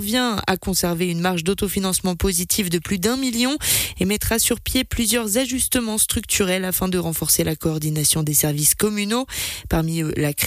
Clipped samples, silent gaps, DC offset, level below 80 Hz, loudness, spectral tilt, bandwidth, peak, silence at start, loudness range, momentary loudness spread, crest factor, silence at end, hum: under 0.1%; none; under 0.1%; -38 dBFS; -20 LUFS; -3.5 dB/octave; 15.5 kHz; -6 dBFS; 0 s; 2 LU; 5 LU; 16 dB; 0 s; none